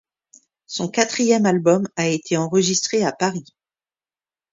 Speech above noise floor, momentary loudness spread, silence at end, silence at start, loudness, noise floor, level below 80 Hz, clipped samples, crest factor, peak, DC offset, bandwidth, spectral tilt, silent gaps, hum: over 71 dB; 8 LU; 1.1 s; 0.7 s; -19 LUFS; under -90 dBFS; -64 dBFS; under 0.1%; 20 dB; 0 dBFS; under 0.1%; 7.8 kHz; -4 dB/octave; none; none